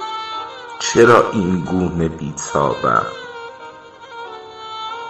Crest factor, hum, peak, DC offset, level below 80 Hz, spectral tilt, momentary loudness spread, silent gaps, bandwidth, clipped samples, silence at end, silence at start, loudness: 18 dB; none; 0 dBFS; under 0.1%; -46 dBFS; -5 dB/octave; 22 LU; none; 11 kHz; under 0.1%; 0 s; 0 s; -17 LUFS